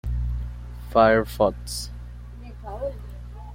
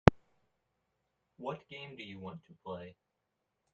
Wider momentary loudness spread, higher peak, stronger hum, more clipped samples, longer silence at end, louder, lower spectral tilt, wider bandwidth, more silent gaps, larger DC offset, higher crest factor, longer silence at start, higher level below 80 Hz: first, 22 LU vs 8 LU; about the same, -4 dBFS vs -2 dBFS; first, 60 Hz at -35 dBFS vs none; neither; second, 0 s vs 0.85 s; first, -24 LUFS vs -40 LUFS; second, -5.5 dB/octave vs -7.5 dB/octave; first, 16.5 kHz vs 7.8 kHz; neither; neither; second, 22 dB vs 36 dB; about the same, 0.05 s vs 0.05 s; first, -34 dBFS vs -52 dBFS